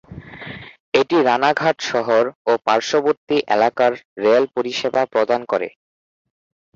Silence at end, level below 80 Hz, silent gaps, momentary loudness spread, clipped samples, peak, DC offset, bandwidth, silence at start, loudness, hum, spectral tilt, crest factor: 1.05 s; -58 dBFS; 0.80-0.92 s, 2.35-2.45 s, 3.17-3.27 s, 4.05-4.16 s; 16 LU; under 0.1%; -2 dBFS; under 0.1%; 7.6 kHz; 0.1 s; -18 LUFS; none; -4.5 dB/octave; 18 dB